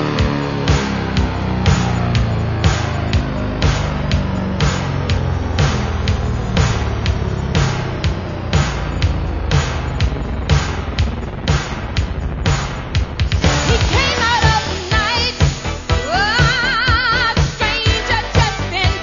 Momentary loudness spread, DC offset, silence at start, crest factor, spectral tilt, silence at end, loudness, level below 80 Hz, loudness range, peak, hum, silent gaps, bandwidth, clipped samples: 7 LU; under 0.1%; 0 s; 16 dB; -5 dB/octave; 0 s; -17 LUFS; -24 dBFS; 4 LU; 0 dBFS; none; none; 7.4 kHz; under 0.1%